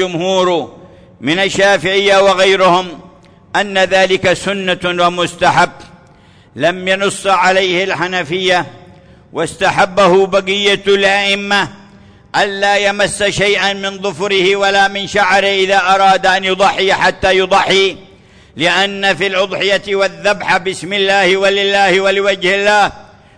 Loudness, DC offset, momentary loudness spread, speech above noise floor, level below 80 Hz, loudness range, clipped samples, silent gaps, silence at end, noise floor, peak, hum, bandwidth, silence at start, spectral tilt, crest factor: -12 LUFS; under 0.1%; 7 LU; 32 dB; -46 dBFS; 3 LU; under 0.1%; none; 0.35 s; -44 dBFS; -2 dBFS; none; 10.5 kHz; 0 s; -3.5 dB/octave; 12 dB